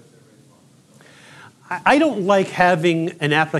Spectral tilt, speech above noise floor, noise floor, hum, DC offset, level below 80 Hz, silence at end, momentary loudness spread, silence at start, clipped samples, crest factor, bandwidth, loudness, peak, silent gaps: -5.5 dB/octave; 34 dB; -52 dBFS; none; under 0.1%; -58 dBFS; 0 s; 6 LU; 1.7 s; under 0.1%; 18 dB; 13 kHz; -17 LUFS; -2 dBFS; none